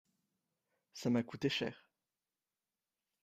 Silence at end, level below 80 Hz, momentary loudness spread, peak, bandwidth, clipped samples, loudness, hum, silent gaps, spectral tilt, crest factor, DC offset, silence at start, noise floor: 1.45 s; -78 dBFS; 8 LU; -22 dBFS; 15 kHz; under 0.1%; -38 LUFS; none; none; -5.5 dB/octave; 22 dB; under 0.1%; 0.95 s; under -90 dBFS